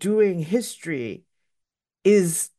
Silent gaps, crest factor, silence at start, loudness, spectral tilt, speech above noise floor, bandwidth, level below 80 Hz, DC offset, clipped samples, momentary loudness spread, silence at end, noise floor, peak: none; 16 dB; 0 s; -22 LUFS; -5 dB/octave; 60 dB; 12.5 kHz; -72 dBFS; under 0.1%; under 0.1%; 13 LU; 0.1 s; -81 dBFS; -8 dBFS